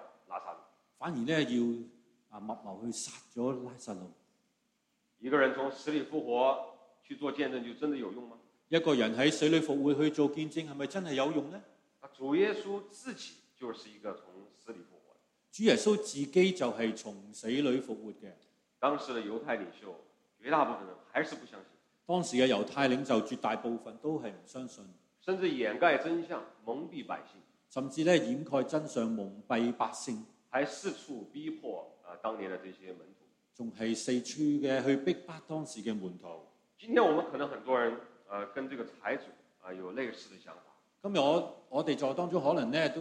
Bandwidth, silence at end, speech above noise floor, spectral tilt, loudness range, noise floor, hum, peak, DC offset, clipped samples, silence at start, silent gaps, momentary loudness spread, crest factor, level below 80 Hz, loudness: 11.5 kHz; 0 s; 45 dB; -5 dB/octave; 7 LU; -78 dBFS; none; -12 dBFS; under 0.1%; under 0.1%; 0 s; none; 19 LU; 22 dB; -80 dBFS; -33 LUFS